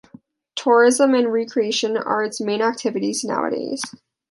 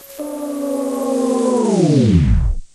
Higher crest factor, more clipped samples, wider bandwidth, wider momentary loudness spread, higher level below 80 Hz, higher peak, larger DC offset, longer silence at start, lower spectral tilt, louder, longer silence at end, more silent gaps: about the same, 16 dB vs 14 dB; neither; second, 11.5 kHz vs 14.5 kHz; about the same, 12 LU vs 11 LU; second, -72 dBFS vs -24 dBFS; about the same, -4 dBFS vs -2 dBFS; neither; first, 0.55 s vs 0.05 s; second, -3 dB/octave vs -7.5 dB/octave; second, -20 LUFS vs -17 LUFS; first, 0.4 s vs 0.1 s; neither